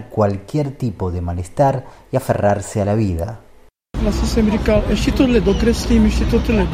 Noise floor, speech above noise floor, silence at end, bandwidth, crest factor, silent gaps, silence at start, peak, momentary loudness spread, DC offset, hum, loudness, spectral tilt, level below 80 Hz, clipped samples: -38 dBFS; 21 dB; 0 s; 15.5 kHz; 14 dB; none; 0 s; -2 dBFS; 9 LU; under 0.1%; none; -18 LUFS; -6.5 dB/octave; -24 dBFS; under 0.1%